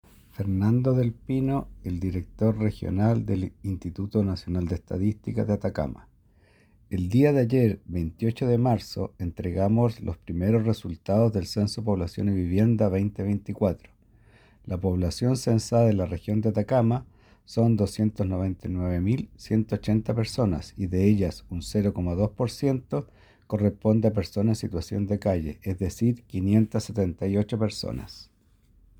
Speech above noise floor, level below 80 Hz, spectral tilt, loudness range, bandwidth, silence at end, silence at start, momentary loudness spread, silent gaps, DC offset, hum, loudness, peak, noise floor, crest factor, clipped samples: 35 dB; -46 dBFS; -8 dB/octave; 3 LU; 14.5 kHz; 0.75 s; 0.4 s; 10 LU; none; under 0.1%; none; -26 LUFS; -8 dBFS; -60 dBFS; 18 dB; under 0.1%